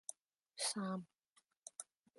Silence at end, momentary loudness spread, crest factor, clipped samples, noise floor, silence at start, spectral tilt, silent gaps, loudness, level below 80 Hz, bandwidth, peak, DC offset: 0.35 s; 18 LU; 22 dB; under 0.1%; -78 dBFS; 0.1 s; -3 dB/octave; 0.21-0.25 s, 1.32-1.36 s, 1.57-1.62 s; -44 LUFS; under -90 dBFS; 12 kHz; -28 dBFS; under 0.1%